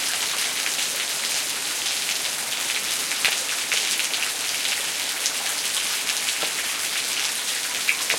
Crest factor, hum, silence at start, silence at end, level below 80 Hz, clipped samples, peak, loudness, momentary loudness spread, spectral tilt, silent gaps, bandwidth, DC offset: 24 dB; none; 0 s; 0 s; -68 dBFS; under 0.1%; -2 dBFS; -22 LUFS; 3 LU; 2 dB/octave; none; 17 kHz; under 0.1%